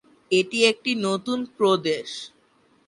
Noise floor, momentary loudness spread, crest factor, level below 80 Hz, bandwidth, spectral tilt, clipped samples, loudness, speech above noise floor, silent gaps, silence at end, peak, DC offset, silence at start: -61 dBFS; 13 LU; 18 dB; -70 dBFS; 11.5 kHz; -4 dB/octave; under 0.1%; -23 LUFS; 38 dB; none; 0.6 s; -6 dBFS; under 0.1%; 0.3 s